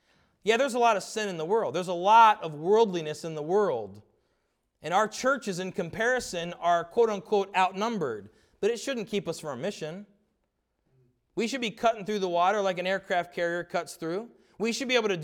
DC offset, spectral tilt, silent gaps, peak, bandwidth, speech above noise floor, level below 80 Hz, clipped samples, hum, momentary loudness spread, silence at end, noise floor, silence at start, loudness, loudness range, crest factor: under 0.1%; -4 dB/octave; none; -8 dBFS; 17 kHz; 50 dB; -68 dBFS; under 0.1%; none; 11 LU; 0 s; -77 dBFS; 0.45 s; -27 LUFS; 9 LU; 20 dB